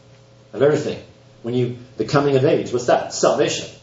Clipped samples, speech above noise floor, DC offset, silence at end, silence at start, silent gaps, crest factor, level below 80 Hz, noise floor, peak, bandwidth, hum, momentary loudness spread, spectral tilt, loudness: under 0.1%; 29 dB; under 0.1%; 0.05 s; 0.55 s; none; 20 dB; -58 dBFS; -48 dBFS; 0 dBFS; 8 kHz; none; 12 LU; -5 dB/octave; -19 LUFS